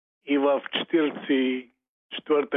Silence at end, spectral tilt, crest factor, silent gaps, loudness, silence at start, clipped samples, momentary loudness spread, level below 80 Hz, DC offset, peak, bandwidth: 0 s; -8 dB/octave; 14 dB; 1.89-2.09 s; -25 LUFS; 0.25 s; under 0.1%; 11 LU; -82 dBFS; under 0.1%; -12 dBFS; 4 kHz